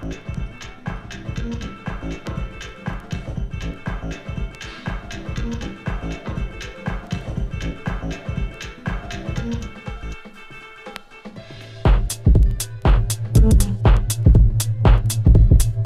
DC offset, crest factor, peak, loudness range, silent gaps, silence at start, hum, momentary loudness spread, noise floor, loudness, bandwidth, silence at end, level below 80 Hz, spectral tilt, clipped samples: under 0.1%; 18 dB; 0 dBFS; 13 LU; none; 0 s; none; 18 LU; -39 dBFS; -22 LUFS; 14.5 kHz; 0 s; -22 dBFS; -6 dB/octave; under 0.1%